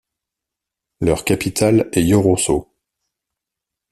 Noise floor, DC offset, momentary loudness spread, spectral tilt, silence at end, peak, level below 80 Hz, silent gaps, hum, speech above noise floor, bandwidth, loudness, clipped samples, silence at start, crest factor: -84 dBFS; under 0.1%; 6 LU; -5.5 dB/octave; 1.3 s; -2 dBFS; -42 dBFS; none; none; 68 dB; 14 kHz; -17 LUFS; under 0.1%; 1 s; 18 dB